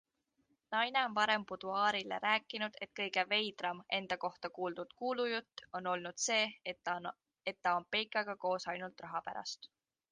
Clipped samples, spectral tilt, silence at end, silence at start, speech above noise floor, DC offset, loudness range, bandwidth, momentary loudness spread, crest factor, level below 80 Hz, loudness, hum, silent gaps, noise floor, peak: under 0.1%; -2 dB/octave; 0.45 s; 0.7 s; 42 dB; under 0.1%; 4 LU; 9.6 kHz; 10 LU; 22 dB; -80 dBFS; -37 LUFS; none; none; -79 dBFS; -18 dBFS